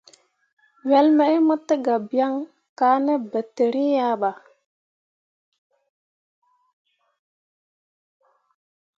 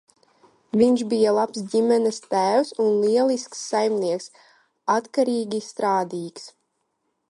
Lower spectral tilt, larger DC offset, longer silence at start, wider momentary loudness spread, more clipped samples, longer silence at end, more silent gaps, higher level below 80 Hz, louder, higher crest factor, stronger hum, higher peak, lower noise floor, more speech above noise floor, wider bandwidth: about the same, -6 dB/octave vs -5 dB/octave; neither; about the same, 0.85 s vs 0.75 s; about the same, 11 LU vs 11 LU; neither; first, 4.65 s vs 0.8 s; first, 2.69-2.76 s vs none; second, -84 dBFS vs -70 dBFS; about the same, -21 LUFS vs -22 LUFS; about the same, 18 dB vs 16 dB; neither; about the same, -6 dBFS vs -6 dBFS; second, -56 dBFS vs -74 dBFS; second, 36 dB vs 53 dB; second, 7.4 kHz vs 11.5 kHz